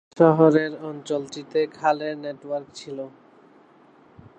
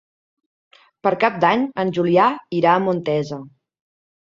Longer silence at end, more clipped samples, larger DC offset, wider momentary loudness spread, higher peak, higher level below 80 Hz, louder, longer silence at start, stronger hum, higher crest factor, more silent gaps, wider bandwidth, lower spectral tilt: first, 1.3 s vs 0.8 s; neither; neither; first, 19 LU vs 8 LU; about the same, -4 dBFS vs -2 dBFS; second, -68 dBFS vs -62 dBFS; second, -23 LUFS vs -19 LUFS; second, 0.15 s vs 1.05 s; neither; about the same, 20 dB vs 18 dB; neither; first, 8.8 kHz vs 7.6 kHz; about the same, -7 dB/octave vs -7 dB/octave